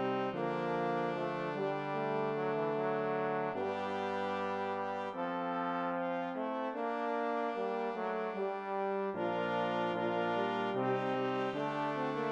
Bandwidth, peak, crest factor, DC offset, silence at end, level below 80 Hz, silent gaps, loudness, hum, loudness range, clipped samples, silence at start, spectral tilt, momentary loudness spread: 9 kHz; -22 dBFS; 14 dB; under 0.1%; 0 s; -82 dBFS; none; -36 LUFS; none; 2 LU; under 0.1%; 0 s; -7 dB/octave; 3 LU